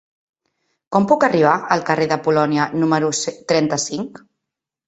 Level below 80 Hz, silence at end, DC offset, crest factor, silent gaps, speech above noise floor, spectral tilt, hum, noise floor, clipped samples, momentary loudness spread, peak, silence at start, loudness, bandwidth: -60 dBFS; 0.8 s; under 0.1%; 18 dB; none; 65 dB; -4.5 dB/octave; none; -83 dBFS; under 0.1%; 8 LU; -2 dBFS; 0.9 s; -18 LUFS; 8.4 kHz